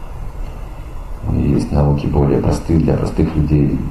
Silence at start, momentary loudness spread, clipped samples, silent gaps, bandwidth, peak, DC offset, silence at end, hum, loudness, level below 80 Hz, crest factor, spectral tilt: 0 s; 17 LU; under 0.1%; none; 11 kHz; 0 dBFS; under 0.1%; 0 s; none; -16 LUFS; -24 dBFS; 16 dB; -9 dB/octave